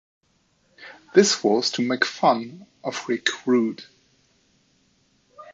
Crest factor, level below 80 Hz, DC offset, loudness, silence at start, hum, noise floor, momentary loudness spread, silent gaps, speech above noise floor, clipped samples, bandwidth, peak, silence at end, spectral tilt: 22 dB; -74 dBFS; under 0.1%; -22 LUFS; 0.8 s; none; -66 dBFS; 20 LU; none; 44 dB; under 0.1%; 7.8 kHz; -2 dBFS; 0 s; -3.5 dB/octave